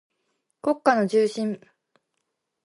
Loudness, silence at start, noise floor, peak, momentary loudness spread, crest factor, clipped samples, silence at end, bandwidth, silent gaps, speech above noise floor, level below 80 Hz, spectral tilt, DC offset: -23 LUFS; 0.65 s; -79 dBFS; -6 dBFS; 10 LU; 20 dB; under 0.1%; 1.05 s; 11.5 kHz; none; 56 dB; -78 dBFS; -5.5 dB/octave; under 0.1%